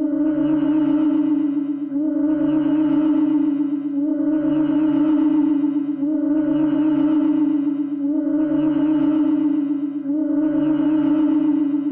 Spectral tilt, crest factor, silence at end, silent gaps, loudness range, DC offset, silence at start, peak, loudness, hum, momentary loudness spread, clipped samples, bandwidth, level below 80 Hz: -11 dB/octave; 8 dB; 0 s; none; 1 LU; under 0.1%; 0 s; -12 dBFS; -19 LUFS; none; 5 LU; under 0.1%; 3.3 kHz; -58 dBFS